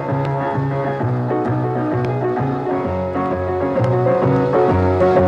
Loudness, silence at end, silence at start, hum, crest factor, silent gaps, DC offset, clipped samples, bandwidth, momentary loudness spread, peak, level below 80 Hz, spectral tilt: -18 LUFS; 0 s; 0 s; none; 12 dB; none; under 0.1%; under 0.1%; 7 kHz; 5 LU; -4 dBFS; -46 dBFS; -9.5 dB/octave